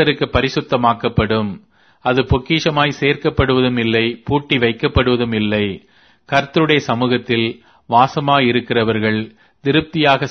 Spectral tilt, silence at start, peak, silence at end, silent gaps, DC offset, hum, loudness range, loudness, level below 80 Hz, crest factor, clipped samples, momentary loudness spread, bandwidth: -6.5 dB/octave; 0 s; 0 dBFS; 0 s; none; under 0.1%; none; 1 LU; -16 LUFS; -36 dBFS; 16 dB; under 0.1%; 6 LU; 6.6 kHz